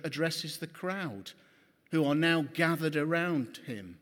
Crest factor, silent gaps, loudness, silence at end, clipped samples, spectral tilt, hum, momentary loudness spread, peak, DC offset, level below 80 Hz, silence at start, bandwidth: 20 dB; none; -31 LUFS; 0.05 s; under 0.1%; -5.5 dB/octave; none; 14 LU; -12 dBFS; under 0.1%; -78 dBFS; 0.05 s; 18 kHz